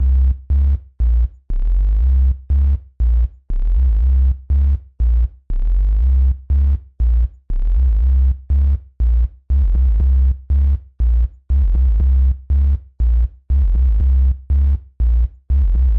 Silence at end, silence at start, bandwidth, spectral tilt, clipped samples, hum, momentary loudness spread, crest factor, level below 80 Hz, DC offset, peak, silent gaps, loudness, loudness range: 0 s; 0 s; 1.5 kHz; -11 dB/octave; under 0.1%; none; 5 LU; 6 dB; -14 dBFS; under 0.1%; -8 dBFS; none; -18 LUFS; 1 LU